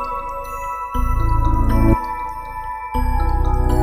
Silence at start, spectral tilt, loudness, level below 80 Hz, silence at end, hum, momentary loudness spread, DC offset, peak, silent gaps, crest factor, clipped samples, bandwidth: 0 s; -8 dB/octave; -21 LUFS; -20 dBFS; 0 s; none; 10 LU; under 0.1%; -2 dBFS; none; 16 dB; under 0.1%; 15 kHz